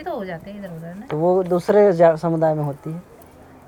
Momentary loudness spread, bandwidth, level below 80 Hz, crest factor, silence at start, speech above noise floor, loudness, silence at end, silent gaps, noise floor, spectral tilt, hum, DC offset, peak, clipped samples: 19 LU; 17.5 kHz; -54 dBFS; 18 dB; 0 s; 26 dB; -18 LUFS; 0.65 s; none; -45 dBFS; -8.5 dB/octave; none; under 0.1%; -2 dBFS; under 0.1%